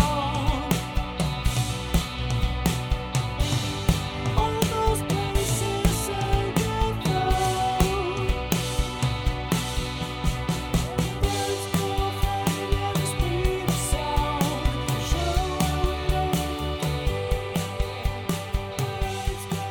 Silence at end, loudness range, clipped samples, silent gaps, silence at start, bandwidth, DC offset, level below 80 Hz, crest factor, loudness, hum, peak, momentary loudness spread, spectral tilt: 0 s; 2 LU; under 0.1%; none; 0 s; 19 kHz; under 0.1%; -30 dBFS; 22 dB; -26 LUFS; none; -2 dBFS; 5 LU; -5 dB/octave